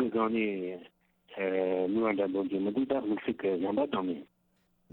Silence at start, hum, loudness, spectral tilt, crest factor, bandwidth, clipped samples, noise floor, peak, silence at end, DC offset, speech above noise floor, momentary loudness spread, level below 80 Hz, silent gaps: 0 s; none; -31 LUFS; -9.5 dB/octave; 16 dB; 4.2 kHz; under 0.1%; -72 dBFS; -16 dBFS; 0.7 s; under 0.1%; 42 dB; 9 LU; -70 dBFS; none